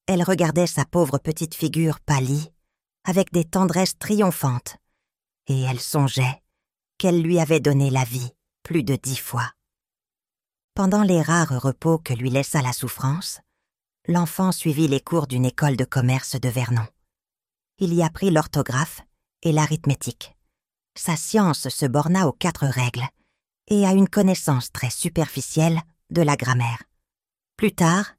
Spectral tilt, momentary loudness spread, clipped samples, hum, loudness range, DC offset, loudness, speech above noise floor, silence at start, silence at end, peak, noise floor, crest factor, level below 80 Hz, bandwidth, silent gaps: -5.5 dB/octave; 9 LU; under 0.1%; none; 3 LU; under 0.1%; -22 LUFS; over 69 dB; 0.1 s; 0.1 s; -4 dBFS; under -90 dBFS; 18 dB; -52 dBFS; 16 kHz; 10.64-10.68 s